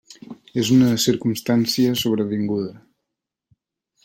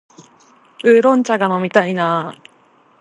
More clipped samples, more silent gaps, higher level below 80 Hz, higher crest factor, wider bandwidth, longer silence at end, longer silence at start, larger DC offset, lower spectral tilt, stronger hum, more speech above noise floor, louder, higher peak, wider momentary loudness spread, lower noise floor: neither; neither; first, -58 dBFS vs -70 dBFS; about the same, 16 dB vs 16 dB; first, 16.5 kHz vs 10.5 kHz; first, 1.3 s vs 0.65 s; second, 0.1 s vs 0.8 s; neither; about the same, -5 dB/octave vs -6 dB/octave; neither; first, 63 dB vs 38 dB; second, -20 LUFS vs -15 LUFS; second, -4 dBFS vs 0 dBFS; first, 14 LU vs 8 LU; first, -83 dBFS vs -52 dBFS